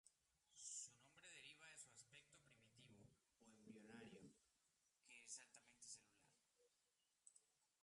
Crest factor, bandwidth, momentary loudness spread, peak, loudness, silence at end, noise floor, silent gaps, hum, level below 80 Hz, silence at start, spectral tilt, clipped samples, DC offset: 24 dB; 11.5 kHz; 12 LU; -44 dBFS; -61 LUFS; 0.15 s; -89 dBFS; none; none; under -90 dBFS; 0.05 s; -1.5 dB/octave; under 0.1%; under 0.1%